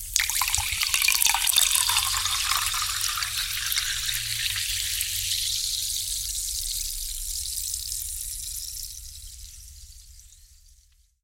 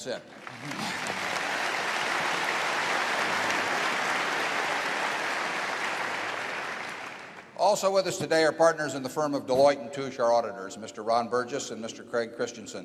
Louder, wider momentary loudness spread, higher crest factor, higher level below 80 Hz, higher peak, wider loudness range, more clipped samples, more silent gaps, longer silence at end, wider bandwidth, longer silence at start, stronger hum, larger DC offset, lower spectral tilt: first, -24 LUFS vs -28 LUFS; first, 15 LU vs 12 LU; first, 28 dB vs 20 dB; first, -44 dBFS vs -74 dBFS; first, 0 dBFS vs -10 dBFS; first, 11 LU vs 3 LU; neither; neither; first, 0.7 s vs 0 s; first, 17 kHz vs 14.5 kHz; about the same, 0 s vs 0 s; neither; neither; second, 2.5 dB/octave vs -3 dB/octave